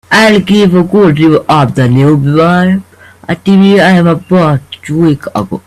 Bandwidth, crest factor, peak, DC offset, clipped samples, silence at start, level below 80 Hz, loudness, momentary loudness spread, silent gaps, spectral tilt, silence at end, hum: 13 kHz; 8 dB; 0 dBFS; under 0.1%; 0.2%; 0.1 s; -42 dBFS; -8 LUFS; 10 LU; none; -7 dB/octave; 0.05 s; none